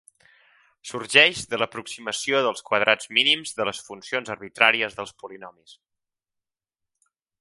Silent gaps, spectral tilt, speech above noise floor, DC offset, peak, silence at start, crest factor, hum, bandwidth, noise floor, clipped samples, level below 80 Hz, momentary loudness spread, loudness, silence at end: none; -1.5 dB/octave; 63 dB; under 0.1%; 0 dBFS; 0.85 s; 26 dB; none; 11.5 kHz; -87 dBFS; under 0.1%; -66 dBFS; 19 LU; -21 LUFS; 1.7 s